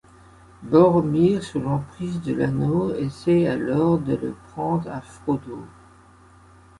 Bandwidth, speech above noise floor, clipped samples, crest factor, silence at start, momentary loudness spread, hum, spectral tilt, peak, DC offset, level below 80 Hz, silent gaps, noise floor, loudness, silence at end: 11.5 kHz; 29 dB; under 0.1%; 20 dB; 0.6 s; 14 LU; none; -8.5 dB/octave; -4 dBFS; under 0.1%; -50 dBFS; none; -51 dBFS; -22 LUFS; 1.15 s